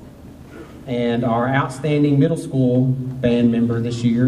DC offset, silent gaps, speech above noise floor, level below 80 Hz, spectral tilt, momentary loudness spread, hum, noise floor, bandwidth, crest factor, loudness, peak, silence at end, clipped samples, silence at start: under 0.1%; none; 22 dB; -48 dBFS; -8 dB/octave; 14 LU; none; -39 dBFS; 11.5 kHz; 14 dB; -19 LUFS; -4 dBFS; 0 s; under 0.1%; 0 s